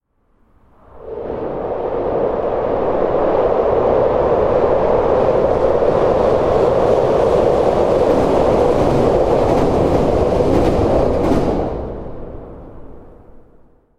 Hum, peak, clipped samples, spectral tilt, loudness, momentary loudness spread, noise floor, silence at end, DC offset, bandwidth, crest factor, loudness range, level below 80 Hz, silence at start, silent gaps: none; -2 dBFS; under 0.1%; -8 dB/octave; -15 LUFS; 10 LU; -57 dBFS; 0.6 s; under 0.1%; 11.5 kHz; 14 dB; 5 LU; -30 dBFS; 0.95 s; none